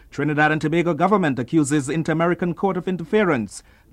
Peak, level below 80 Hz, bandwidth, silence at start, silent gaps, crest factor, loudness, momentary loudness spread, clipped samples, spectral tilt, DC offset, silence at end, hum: -4 dBFS; -52 dBFS; 12.5 kHz; 0.15 s; none; 16 dB; -20 LUFS; 6 LU; under 0.1%; -6 dB/octave; under 0.1%; 0.35 s; none